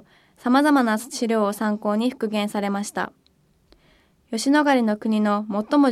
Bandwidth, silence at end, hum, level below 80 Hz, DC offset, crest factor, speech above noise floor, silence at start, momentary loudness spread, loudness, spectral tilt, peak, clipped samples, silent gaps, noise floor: 14.5 kHz; 0 s; none; -66 dBFS; under 0.1%; 16 dB; 41 dB; 0.45 s; 10 LU; -22 LUFS; -5 dB/octave; -6 dBFS; under 0.1%; none; -62 dBFS